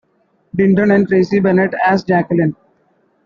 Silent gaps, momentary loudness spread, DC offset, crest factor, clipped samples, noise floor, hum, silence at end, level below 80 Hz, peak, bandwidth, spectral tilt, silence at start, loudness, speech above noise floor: none; 5 LU; under 0.1%; 14 dB; under 0.1%; -59 dBFS; none; 0.7 s; -52 dBFS; -2 dBFS; 6.8 kHz; -8.5 dB/octave; 0.55 s; -14 LUFS; 46 dB